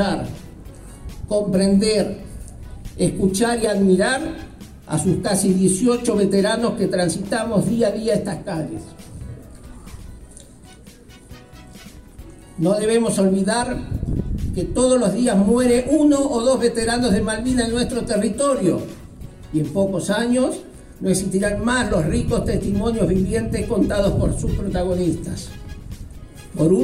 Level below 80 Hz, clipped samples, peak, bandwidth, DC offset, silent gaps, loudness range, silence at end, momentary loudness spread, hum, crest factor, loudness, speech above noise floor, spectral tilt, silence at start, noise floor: -36 dBFS; under 0.1%; -4 dBFS; 14.5 kHz; under 0.1%; none; 7 LU; 0 s; 21 LU; none; 16 dB; -20 LUFS; 25 dB; -5.5 dB/octave; 0 s; -43 dBFS